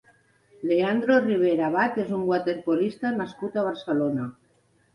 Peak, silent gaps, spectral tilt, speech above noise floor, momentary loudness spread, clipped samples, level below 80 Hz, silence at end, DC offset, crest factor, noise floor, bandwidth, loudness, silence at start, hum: -8 dBFS; none; -7.5 dB/octave; 40 dB; 9 LU; under 0.1%; -66 dBFS; 0.65 s; under 0.1%; 16 dB; -64 dBFS; 11 kHz; -25 LUFS; 0.6 s; none